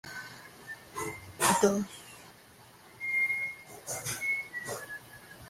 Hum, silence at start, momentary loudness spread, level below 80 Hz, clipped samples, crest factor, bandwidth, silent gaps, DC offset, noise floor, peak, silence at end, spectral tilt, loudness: none; 0.05 s; 20 LU; -68 dBFS; under 0.1%; 24 dB; 16 kHz; none; under 0.1%; -56 dBFS; -12 dBFS; 0 s; -3 dB/octave; -31 LUFS